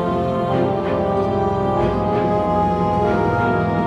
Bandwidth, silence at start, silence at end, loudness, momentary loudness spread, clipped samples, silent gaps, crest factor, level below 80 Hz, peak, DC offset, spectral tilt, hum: 9.8 kHz; 0 s; 0 s; -19 LUFS; 2 LU; under 0.1%; none; 12 dB; -36 dBFS; -6 dBFS; under 0.1%; -8.5 dB/octave; none